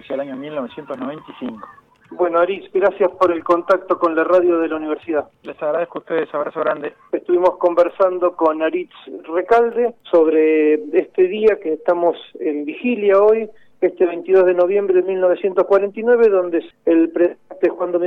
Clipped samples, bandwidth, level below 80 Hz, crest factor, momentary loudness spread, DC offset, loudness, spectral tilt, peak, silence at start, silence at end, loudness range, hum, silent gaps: under 0.1%; 5.6 kHz; -62 dBFS; 14 dB; 12 LU; under 0.1%; -17 LUFS; -7.5 dB/octave; -4 dBFS; 0.1 s; 0 s; 4 LU; none; none